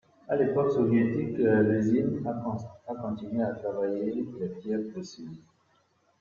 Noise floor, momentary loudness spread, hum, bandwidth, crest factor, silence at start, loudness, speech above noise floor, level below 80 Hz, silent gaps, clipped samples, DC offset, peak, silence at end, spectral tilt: -68 dBFS; 14 LU; none; 7.2 kHz; 16 dB; 0.3 s; -28 LUFS; 40 dB; -66 dBFS; none; under 0.1%; under 0.1%; -12 dBFS; 0.85 s; -8.5 dB/octave